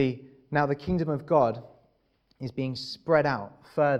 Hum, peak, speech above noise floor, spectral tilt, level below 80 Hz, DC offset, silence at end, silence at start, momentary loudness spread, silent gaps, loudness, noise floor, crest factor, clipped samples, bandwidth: none; -8 dBFS; 43 dB; -7.5 dB/octave; -56 dBFS; under 0.1%; 0 s; 0 s; 13 LU; none; -28 LUFS; -69 dBFS; 20 dB; under 0.1%; 9.8 kHz